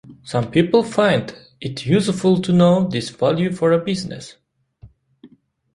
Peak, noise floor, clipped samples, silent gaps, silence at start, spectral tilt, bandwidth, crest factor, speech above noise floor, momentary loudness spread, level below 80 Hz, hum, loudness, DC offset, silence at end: -2 dBFS; -49 dBFS; under 0.1%; none; 0.1 s; -6.5 dB/octave; 11.5 kHz; 16 dB; 32 dB; 16 LU; -54 dBFS; none; -18 LUFS; under 0.1%; 0.5 s